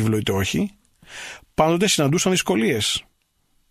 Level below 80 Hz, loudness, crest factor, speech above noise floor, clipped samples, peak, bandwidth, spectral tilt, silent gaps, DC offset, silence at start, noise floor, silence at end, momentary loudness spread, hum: -48 dBFS; -20 LUFS; 18 dB; 45 dB; under 0.1%; -4 dBFS; 15 kHz; -4 dB/octave; none; under 0.1%; 0 s; -65 dBFS; 0.7 s; 17 LU; none